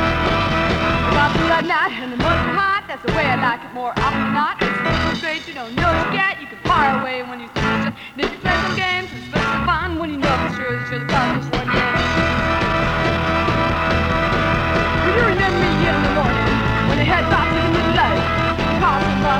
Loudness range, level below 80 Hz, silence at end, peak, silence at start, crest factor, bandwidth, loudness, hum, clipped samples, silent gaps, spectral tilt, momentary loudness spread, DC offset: 3 LU; -32 dBFS; 0 s; -2 dBFS; 0 s; 16 dB; 16.5 kHz; -18 LUFS; none; under 0.1%; none; -6 dB/octave; 6 LU; under 0.1%